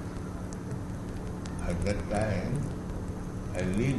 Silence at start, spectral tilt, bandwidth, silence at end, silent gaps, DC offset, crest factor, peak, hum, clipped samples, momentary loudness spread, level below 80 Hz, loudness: 0 s; -7 dB/octave; 12 kHz; 0 s; none; under 0.1%; 18 dB; -14 dBFS; none; under 0.1%; 8 LU; -40 dBFS; -34 LUFS